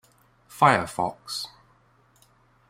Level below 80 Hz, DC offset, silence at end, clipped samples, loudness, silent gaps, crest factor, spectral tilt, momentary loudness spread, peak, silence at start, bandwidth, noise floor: -62 dBFS; under 0.1%; 1.25 s; under 0.1%; -24 LUFS; none; 24 dB; -4.5 dB/octave; 13 LU; -4 dBFS; 0.55 s; 16 kHz; -61 dBFS